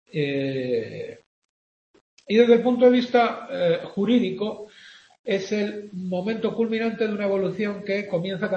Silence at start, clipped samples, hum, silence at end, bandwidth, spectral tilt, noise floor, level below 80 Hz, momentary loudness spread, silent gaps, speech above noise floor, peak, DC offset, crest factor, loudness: 0.15 s; under 0.1%; none; 0 s; 7.6 kHz; -6.5 dB/octave; -49 dBFS; -68 dBFS; 13 LU; 1.26-1.94 s, 2.01-2.17 s, 5.19-5.24 s; 27 dB; -4 dBFS; under 0.1%; 20 dB; -23 LUFS